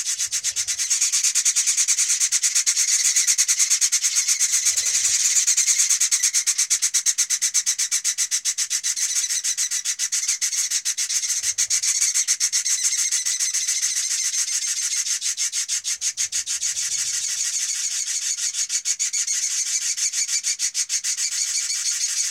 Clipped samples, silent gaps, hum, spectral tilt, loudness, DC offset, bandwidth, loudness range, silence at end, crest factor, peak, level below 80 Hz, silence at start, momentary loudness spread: under 0.1%; none; none; 6 dB/octave; -19 LUFS; under 0.1%; 16.5 kHz; 5 LU; 0 s; 18 dB; -4 dBFS; -72 dBFS; 0 s; 5 LU